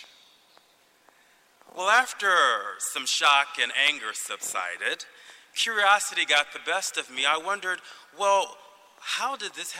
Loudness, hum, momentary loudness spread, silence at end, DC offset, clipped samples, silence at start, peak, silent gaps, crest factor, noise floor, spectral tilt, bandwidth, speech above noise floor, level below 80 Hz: -24 LUFS; none; 12 LU; 0 s; under 0.1%; under 0.1%; 0 s; -8 dBFS; none; 20 dB; -62 dBFS; 1.5 dB/octave; 16 kHz; 36 dB; -82 dBFS